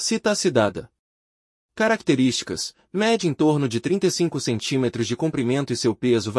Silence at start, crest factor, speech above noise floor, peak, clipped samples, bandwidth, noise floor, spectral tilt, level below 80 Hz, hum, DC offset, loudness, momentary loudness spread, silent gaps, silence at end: 0 s; 16 dB; over 68 dB; -6 dBFS; under 0.1%; 12 kHz; under -90 dBFS; -4.5 dB/octave; -60 dBFS; none; under 0.1%; -22 LUFS; 5 LU; 0.99-1.69 s; 0 s